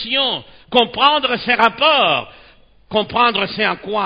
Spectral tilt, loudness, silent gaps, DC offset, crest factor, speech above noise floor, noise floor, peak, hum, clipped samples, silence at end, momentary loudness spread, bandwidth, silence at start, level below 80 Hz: -5.5 dB/octave; -15 LUFS; none; under 0.1%; 18 dB; 31 dB; -47 dBFS; 0 dBFS; none; under 0.1%; 0 s; 8 LU; 8 kHz; 0 s; -52 dBFS